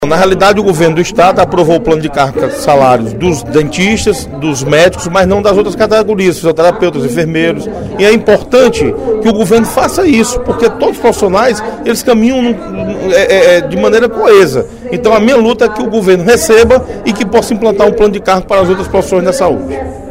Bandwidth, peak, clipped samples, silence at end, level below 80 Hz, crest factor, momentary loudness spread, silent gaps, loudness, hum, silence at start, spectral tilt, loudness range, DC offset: 16.5 kHz; 0 dBFS; 1%; 0 s; -32 dBFS; 8 dB; 7 LU; none; -9 LUFS; none; 0 s; -5 dB/octave; 2 LU; under 0.1%